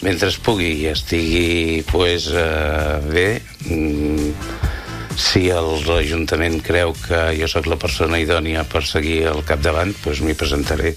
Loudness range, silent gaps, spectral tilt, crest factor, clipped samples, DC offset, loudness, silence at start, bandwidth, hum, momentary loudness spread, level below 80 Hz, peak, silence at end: 1 LU; none; -5 dB/octave; 18 dB; under 0.1%; under 0.1%; -18 LUFS; 0 s; 15.5 kHz; none; 5 LU; -28 dBFS; 0 dBFS; 0 s